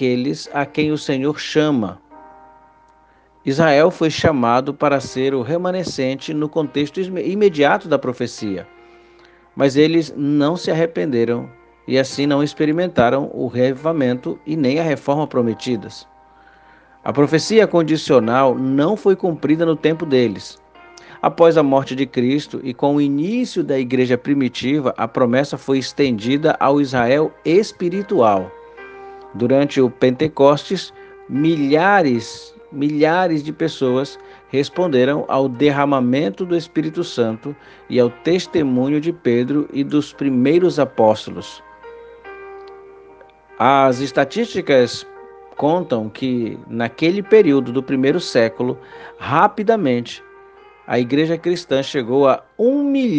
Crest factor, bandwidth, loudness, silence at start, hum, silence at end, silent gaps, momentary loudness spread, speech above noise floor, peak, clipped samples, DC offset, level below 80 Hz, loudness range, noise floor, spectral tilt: 18 dB; 9.2 kHz; -17 LUFS; 0 s; none; 0 s; none; 11 LU; 36 dB; 0 dBFS; under 0.1%; under 0.1%; -58 dBFS; 3 LU; -52 dBFS; -6 dB/octave